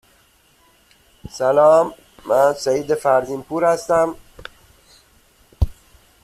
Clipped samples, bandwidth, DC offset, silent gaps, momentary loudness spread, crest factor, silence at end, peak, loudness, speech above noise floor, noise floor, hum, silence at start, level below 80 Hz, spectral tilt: under 0.1%; 14.5 kHz; under 0.1%; none; 23 LU; 18 dB; 0.5 s; -2 dBFS; -18 LUFS; 39 dB; -56 dBFS; none; 1.25 s; -36 dBFS; -5.5 dB/octave